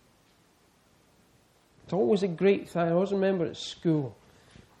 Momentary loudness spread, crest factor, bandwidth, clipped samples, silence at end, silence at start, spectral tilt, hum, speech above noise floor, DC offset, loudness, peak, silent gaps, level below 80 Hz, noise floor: 8 LU; 18 dB; 11 kHz; under 0.1%; 0.65 s; 1.85 s; -7 dB/octave; none; 37 dB; under 0.1%; -28 LUFS; -12 dBFS; none; -68 dBFS; -64 dBFS